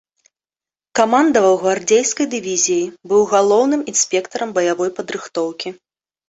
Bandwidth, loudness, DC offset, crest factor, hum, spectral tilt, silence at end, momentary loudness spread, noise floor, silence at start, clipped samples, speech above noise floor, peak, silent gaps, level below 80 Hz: 8.2 kHz; -17 LUFS; under 0.1%; 16 dB; none; -2.5 dB/octave; 0.55 s; 10 LU; under -90 dBFS; 0.95 s; under 0.1%; over 74 dB; -2 dBFS; none; -62 dBFS